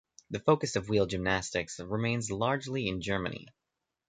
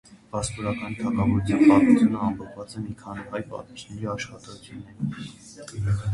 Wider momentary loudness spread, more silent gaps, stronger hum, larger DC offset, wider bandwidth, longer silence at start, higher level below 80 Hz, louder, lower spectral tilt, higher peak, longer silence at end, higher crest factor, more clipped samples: second, 8 LU vs 22 LU; neither; neither; neither; second, 9.6 kHz vs 11.5 kHz; first, 0.3 s vs 0.1 s; second, -54 dBFS vs -46 dBFS; second, -31 LUFS vs -24 LUFS; second, -5 dB/octave vs -6.5 dB/octave; second, -12 dBFS vs -6 dBFS; first, 0.6 s vs 0 s; about the same, 20 dB vs 20 dB; neither